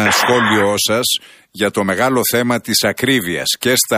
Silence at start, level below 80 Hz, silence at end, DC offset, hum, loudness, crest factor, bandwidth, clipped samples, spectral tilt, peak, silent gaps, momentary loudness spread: 0 s; -54 dBFS; 0 s; under 0.1%; none; -15 LUFS; 14 dB; 15.5 kHz; under 0.1%; -3 dB/octave; 0 dBFS; none; 5 LU